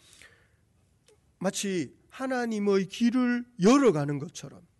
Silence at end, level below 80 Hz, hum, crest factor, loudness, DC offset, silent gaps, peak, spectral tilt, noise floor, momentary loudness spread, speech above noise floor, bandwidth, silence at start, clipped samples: 0.2 s; -66 dBFS; none; 16 dB; -27 LUFS; under 0.1%; none; -12 dBFS; -5.5 dB/octave; -66 dBFS; 15 LU; 40 dB; 12 kHz; 1.4 s; under 0.1%